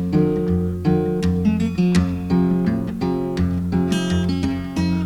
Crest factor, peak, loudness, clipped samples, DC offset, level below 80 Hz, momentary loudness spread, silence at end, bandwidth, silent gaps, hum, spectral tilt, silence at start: 14 dB; -6 dBFS; -20 LUFS; under 0.1%; under 0.1%; -36 dBFS; 5 LU; 0 s; 11.5 kHz; none; none; -7.5 dB/octave; 0 s